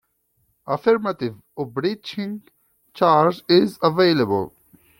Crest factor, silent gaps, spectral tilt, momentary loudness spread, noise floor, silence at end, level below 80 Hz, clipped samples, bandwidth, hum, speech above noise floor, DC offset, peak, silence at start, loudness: 18 dB; none; -7 dB/octave; 14 LU; -68 dBFS; 0.5 s; -62 dBFS; under 0.1%; 17 kHz; none; 48 dB; under 0.1%; -2 dBFS; 0.65 s; -20 LUFS